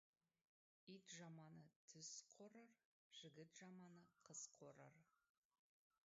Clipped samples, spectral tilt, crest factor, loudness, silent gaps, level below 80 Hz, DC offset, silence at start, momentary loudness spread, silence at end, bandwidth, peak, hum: under 0.1%; -4 dB/octave; 20 dB; -62 LUFS; 1.76-1.88 s, 2.85-3.11 s; under -90 dBFS; under 0.1%; 0.85 s; 9 LU; 0.95 s; 7.6 kHz; -46 dBFS; none